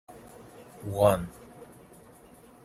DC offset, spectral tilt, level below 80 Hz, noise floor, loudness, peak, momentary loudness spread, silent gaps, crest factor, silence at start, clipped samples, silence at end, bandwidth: under 0.1%; -6 dB/octave; -56 dBFS; -54 dBFS; -26 LUFS; -8 dBFS; 26 LU; none; 24 dB; 0.1 s; under 0.1%; 1 s; 15.5 kHz